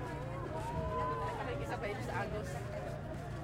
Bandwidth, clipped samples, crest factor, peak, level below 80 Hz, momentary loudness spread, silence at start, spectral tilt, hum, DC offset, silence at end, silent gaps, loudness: 16 kHz; under 0.1%; 14 dB; -24 dBFS; -50 dBFS; 5 LU; 0 s; -6.5 dB/octave; none; under 0.1%; 0 s; none; -40 LUFS